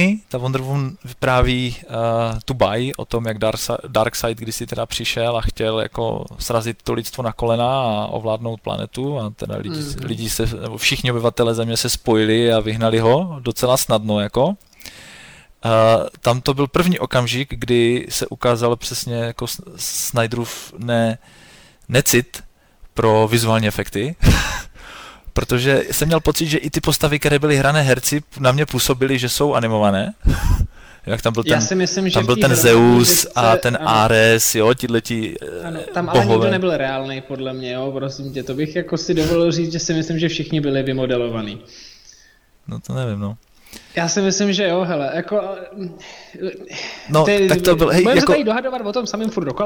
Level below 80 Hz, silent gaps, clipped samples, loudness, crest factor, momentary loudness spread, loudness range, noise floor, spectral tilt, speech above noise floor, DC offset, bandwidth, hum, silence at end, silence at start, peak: -32 dBFS; none; under 0.1%; -18 LUFS; 16 dB; 13 LU; 7 LU; -52 dBFS; -4.5 dB/octave; 34 dB; under 0.1%; over 20 kHz; none; 0 s; 0 s; -2 dBFS